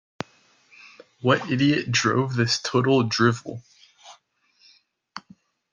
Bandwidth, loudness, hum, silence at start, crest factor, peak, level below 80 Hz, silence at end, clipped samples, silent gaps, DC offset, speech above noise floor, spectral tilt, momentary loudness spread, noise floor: 9.8 kHz; -22 LUFS; none; 0.85 s; 20 dB; -6 dBFS; -64 dBFS; 0.55 s; under 0.1%; none; under 0.1%; 41 dB; -5 dB/octave; 21 LU; -63 dBFS